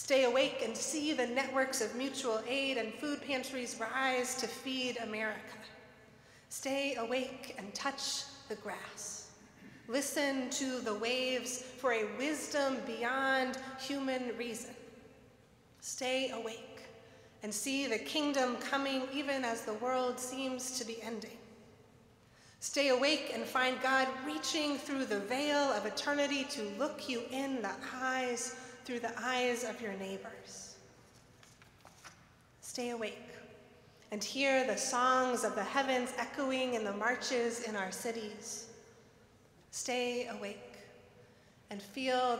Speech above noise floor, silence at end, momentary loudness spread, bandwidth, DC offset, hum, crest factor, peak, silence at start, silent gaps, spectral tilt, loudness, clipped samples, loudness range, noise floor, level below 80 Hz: 28 dB; 0 s; 16 LU; 16 kHz; under 0.1%; none; 20 dB; -16 dBFS; 0 s; none; -2 dB/octave; -35 LUFS; under 0.1%; 8 LU; -63 dBFS; -76 dBFS